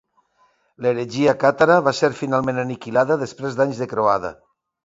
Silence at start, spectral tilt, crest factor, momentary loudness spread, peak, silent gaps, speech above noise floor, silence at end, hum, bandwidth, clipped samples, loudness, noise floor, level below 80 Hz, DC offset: 0.8 s; -6 dB/octave; 20 dB; 9 LU; 0 dBFS; none; 43 dB; 0.55 s; none; 7.8 kHz; under 0.1%; -20 LUFS; -62 dBFS; -58 dBFS; under 0.1%